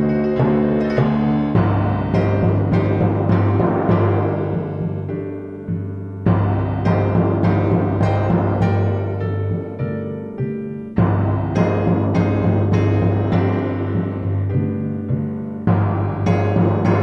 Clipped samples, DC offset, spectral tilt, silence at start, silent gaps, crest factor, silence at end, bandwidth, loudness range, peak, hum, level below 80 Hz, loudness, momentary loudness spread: under 0.1%; under 0.1%; -10 dB/octave; 0 s; none; 14 dB; 0 s; 6 kHz; 3 LU; -4 dBFS; none; -40 dBFS; -19 LUFS; 8 LU